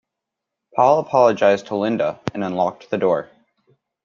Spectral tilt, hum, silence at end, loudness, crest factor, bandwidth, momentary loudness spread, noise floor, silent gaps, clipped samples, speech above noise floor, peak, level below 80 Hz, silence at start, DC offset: -6.5 dB/octave; none; 0.8 s; -19 LUFS; 18 dB; 7.2 kHz; 9 LU; -82 dBFS; none; under 0.1%; 64 dB; -2 dBFS; -64 dBFS; 0.75 s; under 0.1%